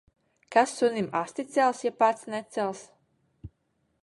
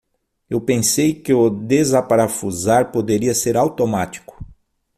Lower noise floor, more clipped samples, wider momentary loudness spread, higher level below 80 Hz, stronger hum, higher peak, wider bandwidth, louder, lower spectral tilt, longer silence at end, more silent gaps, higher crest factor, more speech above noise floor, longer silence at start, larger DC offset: first, -74 dBFS vs -50 dBFS; neither; about the same, 9 LU vs 8 LU; second, -62 dBFS vs -50 dBFS; neither; second, -8 dBFS vs -2 dBFS; second, 11.5 kHz vs 16 kHz; second, -27 LUFS vs -17 LUFS; about the same, -4.5 dB/octave vs -5 dB/octave; about the same, 0.55 s vs 0.45 s; neither; first, 22 dB vs 16 dB; first, 48 dB vs 33 dB; about the same, 0.5 s vs 0.5 s; neither